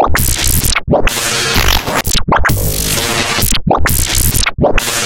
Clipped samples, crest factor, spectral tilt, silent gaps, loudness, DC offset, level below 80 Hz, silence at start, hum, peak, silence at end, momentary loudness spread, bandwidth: under 0.1%; 12 dB; -3 dB/octave; none; -12 LUFS; under 0.1%; -18 dBFS; 0 s; none; 0 dBFS; 0 s; 2 LU; 17.5 kHz